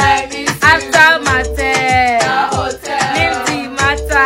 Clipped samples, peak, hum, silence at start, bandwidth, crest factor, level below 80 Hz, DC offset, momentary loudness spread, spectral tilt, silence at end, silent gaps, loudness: 0.4%; 0 dBFS; none; 0 s; 17.5 kHz; 12 dB; -30 dBFS; under 0.1%; 9 LU; -3 dB/octave; 0 s; none; -12 LUFS